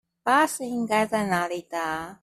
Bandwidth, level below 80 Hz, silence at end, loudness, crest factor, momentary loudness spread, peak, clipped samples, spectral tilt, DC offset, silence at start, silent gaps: 14.5 kHz; -62 dBFS; 0.1 s; -25 LUFS; 18 dB; 8 LU; -8 dBFS; under 0.1%; -4 dB/octave; under 0.1%; 0.25 s; none